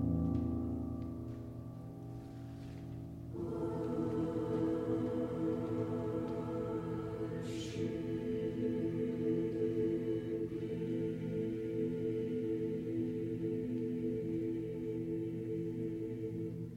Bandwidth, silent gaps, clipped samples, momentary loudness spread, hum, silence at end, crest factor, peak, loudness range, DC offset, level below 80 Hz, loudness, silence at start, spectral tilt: 11.5 kHz; none; under 0.1%; 11 LU; none; 0 s; 14 dB; -22 dBFS; 4 LU; under 0.1%; -58 dBFS; -39 LUFS; 0 s; -9 dB/octave